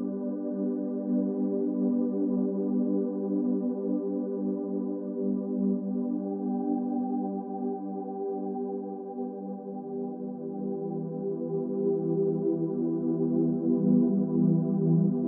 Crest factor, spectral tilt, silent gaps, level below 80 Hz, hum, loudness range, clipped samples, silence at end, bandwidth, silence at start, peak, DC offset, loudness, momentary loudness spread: 16 dB; -12 dB/octave; none; -86 dBFS; none; 8 LU; under 0.1%; 0 s; 1.7 kHz; 0 s; -14 dBFS; under 0.1%; -29 LUFS; 10 LU